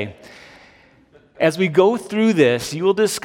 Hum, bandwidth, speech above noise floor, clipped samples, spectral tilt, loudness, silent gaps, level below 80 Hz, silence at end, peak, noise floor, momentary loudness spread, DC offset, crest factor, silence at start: none; 16.5 kHz; 35 dB; under 0.1%; -5 dB/octave; -17 LUFS; none; -60 dBFS; 0.05 s; -2 dBFS; -52 dBFS; 5 LU; under 0.1%; 18 dB; 0 s